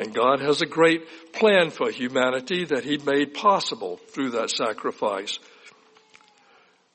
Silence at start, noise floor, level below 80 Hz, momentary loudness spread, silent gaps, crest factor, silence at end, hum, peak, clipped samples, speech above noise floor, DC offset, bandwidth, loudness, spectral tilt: 0 s; -58 dBFS; -72 dBFS; 11 LU; none; 18 dB; 1.25 s; none; -6 dBFS; under 0.1%; 35 dB; under 0.1%; 8.8 kHz; -23 LUFS; -4 dB/octave